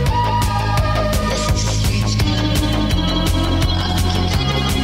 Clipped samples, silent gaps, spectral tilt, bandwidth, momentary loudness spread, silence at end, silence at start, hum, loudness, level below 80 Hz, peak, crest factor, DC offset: under 0.1%; none; -5 dB/octave; 16.5 kHz; 1 LU; 0 s; 0 s; none; -18 LUFS; -22 dBFS; -6 dBFS; 10 dB; under 0.1%